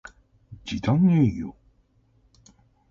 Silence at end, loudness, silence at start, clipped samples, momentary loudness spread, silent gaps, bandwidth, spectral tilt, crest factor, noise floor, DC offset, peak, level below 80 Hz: 1.4 s; -23 LUFS; 0.5 s; under 0.1%; 19 LU; none; 7.4 kHz; -8 dB/octave; 16 dB; -63 dBFS; under 0.1%; -10 dBFS; -50 dBFS